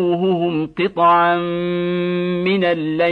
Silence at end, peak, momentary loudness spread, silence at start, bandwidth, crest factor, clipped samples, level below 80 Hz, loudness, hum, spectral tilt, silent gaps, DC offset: 0 s; -4 dBFS; 7 LU; 0 s; 4.8 kHz; 14 dB; under 0.1%; -56 dBFS; -18 LUFS; none; -8.5 dB/octave; none; under 0.1%